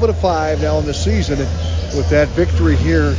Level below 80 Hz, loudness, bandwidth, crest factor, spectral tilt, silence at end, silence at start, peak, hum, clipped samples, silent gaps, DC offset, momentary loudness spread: -20 dBFS; -16 LUFS; 7.6 kHz; 14 dB; -6.5 dB/octave; 0 s; 0 s; -2 dBFS; none; under 0.1%; none; under 0.1%; 5 LU